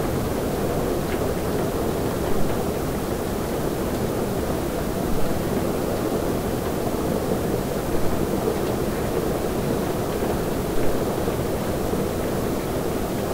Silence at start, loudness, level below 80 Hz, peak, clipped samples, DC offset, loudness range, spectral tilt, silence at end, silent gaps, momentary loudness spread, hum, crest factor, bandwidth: 0 s; -25 LUFS; -36 dBFS; -8 dBFS; under 0.1%; 0.4%; 1 LU; -6 dB/octave; 0 s; none; 2 LU; none; 14 dB; 16 kHz